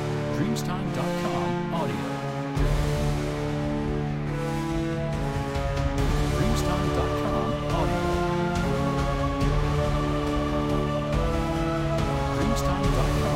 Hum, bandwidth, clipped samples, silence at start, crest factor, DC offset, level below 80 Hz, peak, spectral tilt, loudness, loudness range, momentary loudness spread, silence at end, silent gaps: none; 16 kHz; under 0.1%; 0 s; 14 dB; under 0.1%; -32 dBFS; -10 dBFS; -6.5 dB/octave; -26 LUFS; 2 LU; 4 LU; 0 s; none